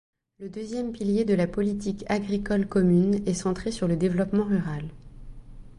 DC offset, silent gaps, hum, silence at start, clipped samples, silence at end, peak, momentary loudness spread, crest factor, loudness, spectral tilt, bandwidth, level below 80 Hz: under 0.1%; none; none; 0.4 s; under 0.1%; 0.05 s; -10 dBFS; 12 LU; 16 dB; -26 LUFS; -7 dB/octave; 11 kHz; -46 dBFS